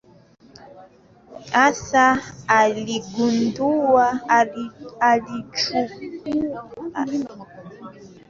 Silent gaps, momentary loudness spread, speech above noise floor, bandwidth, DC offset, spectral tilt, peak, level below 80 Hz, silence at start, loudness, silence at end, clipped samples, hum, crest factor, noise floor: none; 17 LU; 29 dB; 7.6 kHz; under 0.1%; -4 dB/octave; -4 dBFS; -58 dBFS; 0.6 s; -20 LUFS; 0.2 s; under 0.1%; none; 18 dB; -50 dBFS